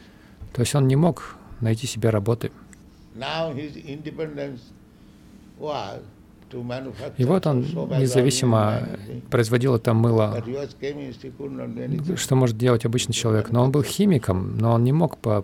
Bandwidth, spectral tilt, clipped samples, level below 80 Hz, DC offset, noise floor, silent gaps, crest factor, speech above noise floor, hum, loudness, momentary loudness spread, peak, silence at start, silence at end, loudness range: 15.5 kHz; -6 dB/octave; under 0.1%; -52 dBFS; under 0.1%; -49 dBFS; none; 18 dB; 27 dB; none; -23 LUFS; 15 LU; -6 dBFS; 0.4 s; 0 s; 12 LU